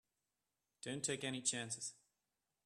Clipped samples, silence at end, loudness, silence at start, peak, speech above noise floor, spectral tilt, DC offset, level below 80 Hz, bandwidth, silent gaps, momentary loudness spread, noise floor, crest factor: under 0.1%; 0.7 s; -42 LUFS; 0.85 s; -22 dBFS; over 47 dB; -2.5 dB/octave; under 0.1%; -84 dBFS; 13.5 kHz; none; 10 LU; under -90 dBFS; 24 dB